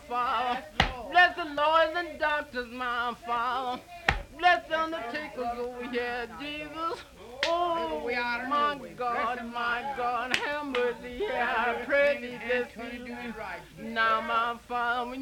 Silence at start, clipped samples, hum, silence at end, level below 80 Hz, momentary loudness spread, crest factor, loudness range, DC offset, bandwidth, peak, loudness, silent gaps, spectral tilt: 0 s; under 0.1%; none; 0 s; -50 dBFS; 11 LU; 26 dB; 4 LU; under 0.1%; 18 kHz; -2 dBFS; -29 LUFS; none; -4 dB/octave